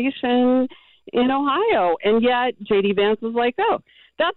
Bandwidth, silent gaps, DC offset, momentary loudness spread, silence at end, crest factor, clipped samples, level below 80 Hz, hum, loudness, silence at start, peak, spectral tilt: 4.3 kHz; none; under 0.1%; 5 LU; 0.05 s; 10 dB; under 0.1%; -56 dBFS; none; -20 LUFS; 0 s; -10 dBFS; -9 dB/octave